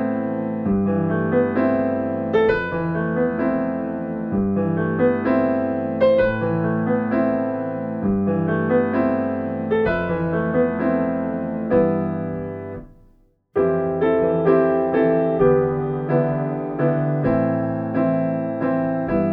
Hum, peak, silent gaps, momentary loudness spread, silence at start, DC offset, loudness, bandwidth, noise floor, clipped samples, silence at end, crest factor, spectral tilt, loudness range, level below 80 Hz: none; -4 dBFS; none; 7 LU; 0 s; under 0.1%; -21 LUFS; 5.2 kHz; -55 dBFS; under 0.1%; 0 s; 16 dB; -11 dB/octave; 3 LU; -46 dBFS